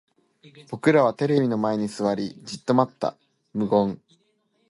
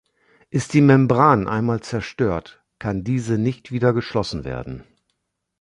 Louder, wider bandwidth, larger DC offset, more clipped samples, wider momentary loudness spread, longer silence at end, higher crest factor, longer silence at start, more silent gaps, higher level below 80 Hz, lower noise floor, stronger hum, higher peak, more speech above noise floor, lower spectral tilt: second, -23 LUFS vs -20 LUFS; about the same, 11.5 kHz vs 11 kHz; neither; neither; about the same, 13 LU vs 15 LU; about the same, 0.75 s vs 0.8 s; about the same, 20 dB vs 18 dB; about the same, 0.55 s vs 0.55 s; neither; second, -64 dBFS vs -46 dBFS; second, -68 dBFS vs -74 dBFS; neither; about the same, -4 dBFS vs -2 dBFS; second, 45 dB vs 55 dB; about the same, -7 dB/octave vs -7 dB/octave